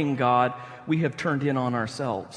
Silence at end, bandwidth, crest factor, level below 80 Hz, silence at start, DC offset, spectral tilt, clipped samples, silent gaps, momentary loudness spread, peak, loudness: 0 s; 10.5 kHz; 16 dB; -66 dBFS; 0 s; under 0.1%; -7 dB/octave; under 0.1%; none; 7 LU; -8 dBFS; -25 LUFS